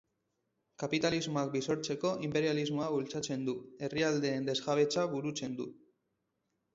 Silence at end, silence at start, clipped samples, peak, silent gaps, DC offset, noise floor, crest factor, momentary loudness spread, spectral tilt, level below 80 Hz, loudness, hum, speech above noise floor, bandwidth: 1 s; 0.8 s; under 0.1%; -18 dBFS; none; under 0.1%; -82 dBFS; 18 dB; 8 LU; -5 dB/octave; -70 dBFS; -34 LUFS; none; 49 dB; 8 kHz